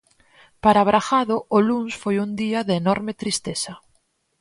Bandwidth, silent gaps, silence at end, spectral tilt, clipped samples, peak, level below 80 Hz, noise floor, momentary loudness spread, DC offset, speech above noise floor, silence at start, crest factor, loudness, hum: 11.5 kHz; none; 0.65 s; -5 dB/octave; under 0.1%; -4 dBFS; -54 dBFS; -66 dBFS; 8 LU; under 0.1%; 46 dB; 0.65 s; 18 dB; -21 LUFS; none